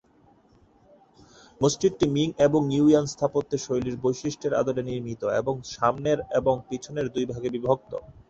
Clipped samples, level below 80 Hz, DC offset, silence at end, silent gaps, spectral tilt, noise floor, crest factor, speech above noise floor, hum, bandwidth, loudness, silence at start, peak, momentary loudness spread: under 0.1%; -54 dBFS; under 0.1%; 0.15 s; none; -6 dB/octave; -59 dBFS; 18 dB; 34 dB; none; 8.2 kHz; -25 LUFS; 1.6 s; -8 dBFS; 9 LU